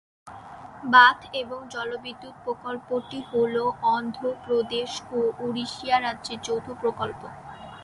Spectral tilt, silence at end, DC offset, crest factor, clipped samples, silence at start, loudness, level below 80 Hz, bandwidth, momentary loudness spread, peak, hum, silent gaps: -3.5 dB/octave; 0 s; under 0.1%; 24 dB; under 0.1%; 0.25 s; -25 LUFS; -62 dBFS; 11.5 kHz; 21 LU; -2 dBFS; none; none